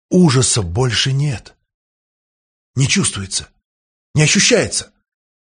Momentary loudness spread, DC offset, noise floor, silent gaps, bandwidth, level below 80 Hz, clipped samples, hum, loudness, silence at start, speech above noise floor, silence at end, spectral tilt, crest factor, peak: 11 LU; under 0.1%; under -90 dBFS; 1.74-2.73 s, 3.65-4.14 s; 10 kHz; -44 dBFS; under 0.1%; none; -15 LUFS; 0.1 s; over 75 dB; 0.55 s; -4 dB/octave; 18 dB; 0 dBFS